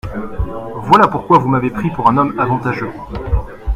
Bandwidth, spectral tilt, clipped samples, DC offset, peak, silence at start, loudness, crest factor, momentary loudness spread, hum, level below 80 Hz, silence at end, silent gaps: 15.5 kHz; -8 dB/octave; 0.1%; under 0.1%; 0 dBFS; 0.05 s; -15 LUFS; 16 dB; 14 LU; none; -26 dBFS; 0 s; none